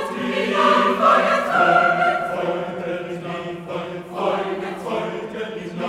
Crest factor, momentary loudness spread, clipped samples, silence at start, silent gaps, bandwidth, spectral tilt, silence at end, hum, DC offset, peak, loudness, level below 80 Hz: 18 dB; 14 LU; under 0.1%; 0 s; none; 15.5 kHz; -5 dB/octave; 0 s; none; under 0.1%; -2 dBFS; -20 LUFS; -60 dBFS